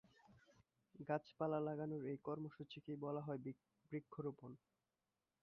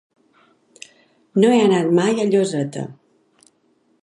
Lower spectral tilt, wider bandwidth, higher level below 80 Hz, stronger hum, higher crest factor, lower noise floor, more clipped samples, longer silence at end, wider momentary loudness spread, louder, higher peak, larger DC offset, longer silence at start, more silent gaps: about the same, -7 dB/octave vs -6 dB/octave; second, 6.6 kHz vs 11.5 kHz; second, -84 dBFS vs -72 dBFS; neither; about the same, 20 dB vs 18 dB; first, under -90 dBFS vs -62 dBFS; neither; second, 0.85 s vs 1.1 s; about the same, 14 LU vs 14 LU; second, -48 LUFS vs -17 LUFS; second, -28 dBFS vs -2 dBFS; neither; second, 0.3 s vs 1.35 s; neither